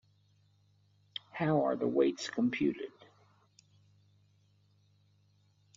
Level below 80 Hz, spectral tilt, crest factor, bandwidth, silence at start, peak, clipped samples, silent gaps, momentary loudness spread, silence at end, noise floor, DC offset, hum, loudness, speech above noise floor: -76 dBFS; -5.5 dB/octave; 20 dB; 7.4 kHz; 1.35 s; -16 dBFS; under 0.1%; none; 16 LU; 2.9 s; -69 dBFS; under 0.1%; 50 Hz at -65 dBFS; -32 LUFS; 38 dB